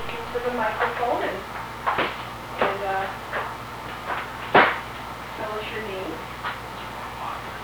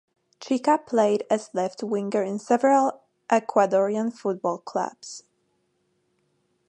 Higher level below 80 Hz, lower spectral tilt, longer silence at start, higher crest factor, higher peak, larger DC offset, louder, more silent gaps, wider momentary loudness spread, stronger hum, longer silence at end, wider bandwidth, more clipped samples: first, -48 dBFS vs -80 dBFS; about the same, -4.5 dB/octave vs -5.5 dB/octave; second, 0 s vs 0.4 s; first, 26 dB vs 20 dB; first, 0 dBFS vs -6 dBFS; neither; about the same, -26 LUFS vs -24 LUFS; neither; first, 13 LU vs 10 LU; first, 60 Hz at -45 dBFS vs none; second, 0 s vs 1.5 s; first, over 20 kHz vs 10.5 kHz; neither